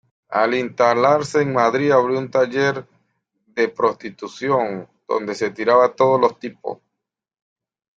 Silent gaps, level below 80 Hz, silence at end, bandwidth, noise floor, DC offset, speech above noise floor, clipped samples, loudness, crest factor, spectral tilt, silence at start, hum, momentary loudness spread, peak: none; -64 dBFS; 1.25 s; 9 kHz; -82 dBFS; under 0.1%; 64 dB; under 0.1%; -19 LUFS; 18 dB; -5.5 dB/octave; 0.3 s; none; 16 LU; -2 dBFS